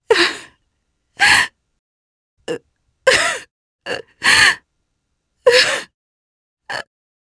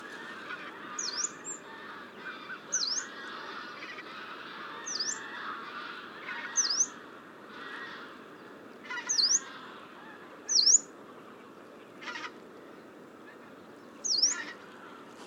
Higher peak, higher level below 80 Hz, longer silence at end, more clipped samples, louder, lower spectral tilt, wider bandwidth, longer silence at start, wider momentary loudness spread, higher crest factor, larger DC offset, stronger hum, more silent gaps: first, 0 dBFS vs -12 dBFS; first, -52 dBFS vs -84 dBFS; first, 0.55 s vs 0 s; neither; first, -14 LUFS vs -30 LUFS; first, -0.5 dB/octave vs 1.5 dB/octave; second, 11 kHz vs 19.5 kHz; about the same, 0.1 s vs 0 s; second, 18 LU vs 24 LU; about the same, 20 dB vs 24 dB; neither; neither; first, 1.79-2.37 s, 3.51-3.79 s, 5.94-6.57 s vs none